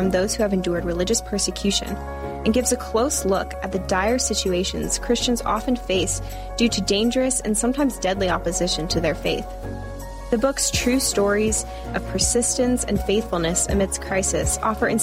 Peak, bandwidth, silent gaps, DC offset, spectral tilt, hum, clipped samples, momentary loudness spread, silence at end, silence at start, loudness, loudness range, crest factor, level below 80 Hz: -8 dBFS; 16 kHz; none; under 0.1%; -3.5 dB/octave; none; under 0.1%; 8 LU; 0 s; 0 s; -22 LUFS; 2 LU; 14 dB; -34 dBFS